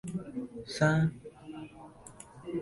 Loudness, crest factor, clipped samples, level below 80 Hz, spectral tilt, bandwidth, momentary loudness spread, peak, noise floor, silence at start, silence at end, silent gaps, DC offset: -32 LUFS; 20 dB; under 0.1%; -60 dBFS; -6.5 dB/octave; 11.5 kHz; 23 LU; -14 dBFS; -52 dBFS; 0.05 s; 0 s; none; under 0.1%